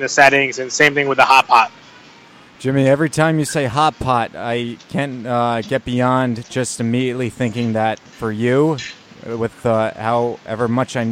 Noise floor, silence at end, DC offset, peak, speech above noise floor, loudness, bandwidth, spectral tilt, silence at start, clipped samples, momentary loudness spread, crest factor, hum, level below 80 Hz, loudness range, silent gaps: -44 dBFS; 0 s; under 0.1%; 0 dBFS; 27 dB; -17 LUFS; 16 kHz; -5 dB/octave; 0 s; under 0.1%; 12 LU; 18 dB; none; -50 dBFS; 5 LU; none